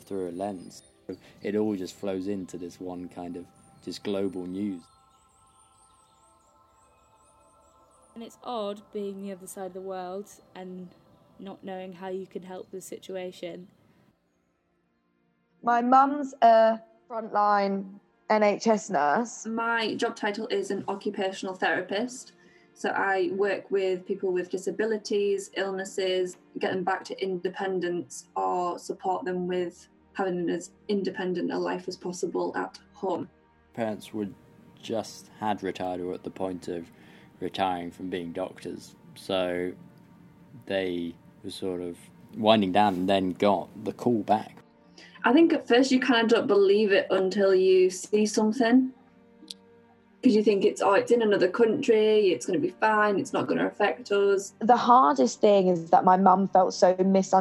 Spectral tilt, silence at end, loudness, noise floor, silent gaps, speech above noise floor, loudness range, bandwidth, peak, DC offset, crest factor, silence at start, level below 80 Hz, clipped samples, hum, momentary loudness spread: -5 dB/octave; 0 s; -26 LUFS; -72 dBFS; none; 46 dB; 16 LU; 13 kHz; -4 dBFS; under 0.1%; 22 dB; 0.1 s; -74 dBFS; under 0.1%; none; 19 LU